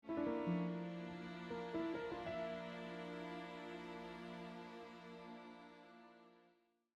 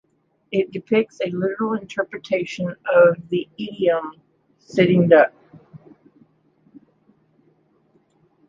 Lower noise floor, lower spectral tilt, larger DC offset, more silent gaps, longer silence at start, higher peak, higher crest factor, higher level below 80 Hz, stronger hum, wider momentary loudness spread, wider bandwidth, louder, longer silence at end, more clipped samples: first, -76 dBFS vs -61 dBFS; about the same, -7.5 dB/octave vs -7.5 dB/octave; neither; neither; second, 0.05 s vs 0.5 s; second, -30 dBFS vs -2 dBFS; about the same, 18 dB vs 20 dB; second, -76 dBFS vs -64 dBFS; neither; first, 17 LU vs 12 LU; first, 9.4 kHz vs 7.4 kHz; second, -47 LUFS vs -20 LUFS; second, 0.5 s vs 2.7 s; neither